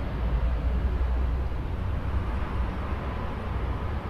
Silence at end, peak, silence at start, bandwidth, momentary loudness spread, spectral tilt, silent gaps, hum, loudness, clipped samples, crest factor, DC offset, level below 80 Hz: 0 s; -16 dBFS; 0 s; 5.6 kHz; 4 LU; -8.5 dB/octave; none; none; -30 LUFS; under 0.1%; 12 dB; under 0.1%; -28 dBFS